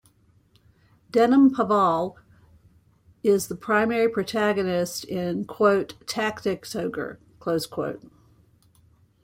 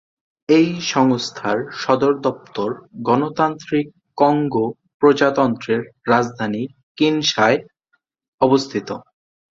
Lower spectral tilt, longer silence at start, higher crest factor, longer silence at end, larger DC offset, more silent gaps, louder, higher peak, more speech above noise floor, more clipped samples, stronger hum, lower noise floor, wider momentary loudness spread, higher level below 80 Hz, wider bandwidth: about the same, -5.5 dB/octave vs -5 dB/octave; first, 1.15 s vs 0.5 s; about the same, 18 dB vs 18 dB; first, 1.25 s vs 0.55 s; neither; second, none vs 4.94-5.00 s, 6.83-6.95 s, 8.28-8.38 s; second, -24 LUFS vs -19 LUFS; second, -6 dBFS vs -2 dBFS; second, 37 dB vs 50 dB; neither; neither; second, -60 dBFS vs -68 dBFS; about the same, 12 LU vs 10 LU; about the same, -62 dBFS vs -60 dBFS; first, 16.5 kHz vs 7.8 kHz